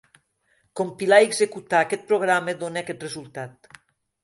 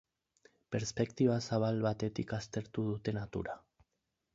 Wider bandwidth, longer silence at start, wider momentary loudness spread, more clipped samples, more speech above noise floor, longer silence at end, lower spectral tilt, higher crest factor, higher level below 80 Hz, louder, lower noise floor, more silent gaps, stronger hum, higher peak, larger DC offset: first, 11.5 kHz vs 7.6 kHz; about the same, 0.75 s vs 0.7 s; first, 20 LU vs 9 LU; neither; second, 45 dB vs 50 dB; about the same, 0.75 s vs 0.75 s; second, -3.5 dB/octave vs -6.5 dB/octave; about the same, 22 dB vs 20 dB; second, -70 dBFS vs -62 dBFS; first, -22 LUFS vs -36 LUFS; second, -67 dBFS vs -85 dBFS; neither; neither; first, -2 dBFS vs -18 dBFS; neither